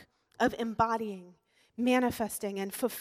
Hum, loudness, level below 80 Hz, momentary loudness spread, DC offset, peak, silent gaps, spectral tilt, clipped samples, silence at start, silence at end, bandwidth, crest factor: none; -31 LUFS; -62 dBFS; 11 LU; under 0.1%; -12 dBFS; none; -4.5 dB/octave; under 0.1%; 0 s; 0 s; 16.5 kHz; 20 dB